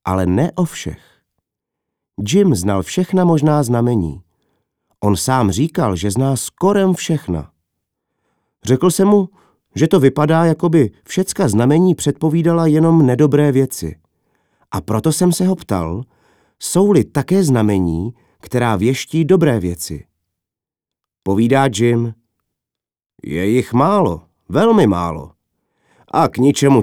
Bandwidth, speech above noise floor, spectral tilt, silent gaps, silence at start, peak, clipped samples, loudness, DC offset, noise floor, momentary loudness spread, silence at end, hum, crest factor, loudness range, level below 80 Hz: 17 kHz; 73 dB; -6.5 dB/octave; none; 0.05 s; 0 dBFS; under 0.1%; -15 LUFS; under 0.1%; -87 dBFS; 13 LU; 0 s; none; 16 dB; 5 LU; -44 dBFS